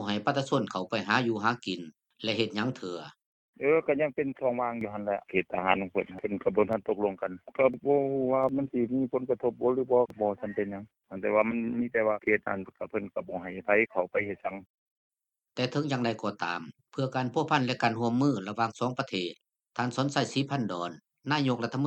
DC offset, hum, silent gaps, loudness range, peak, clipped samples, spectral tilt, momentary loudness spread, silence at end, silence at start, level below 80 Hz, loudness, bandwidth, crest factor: under 0.1%; none; 3.26-3.53 s, 14.66-15.11 s; 3 LU; -8 dBFS; under 0.1%; -6 dB/octave; 10 LU; 0 s; 0 s; -70 dBFS; -30 LUFS; 8.8 kHz; 22 dB